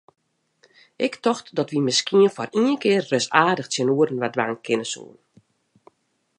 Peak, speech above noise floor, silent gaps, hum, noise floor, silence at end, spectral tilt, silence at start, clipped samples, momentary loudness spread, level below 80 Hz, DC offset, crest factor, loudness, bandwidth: -2 dBFS; 48 dB; none; none; -69 dBFS; 1.35 s; -4 dB/octave; 1 s; under 0.1%; 7 LU; -74 dBFS; under 0.1%; 22 dB; -21 LUFS; 10.5 kHz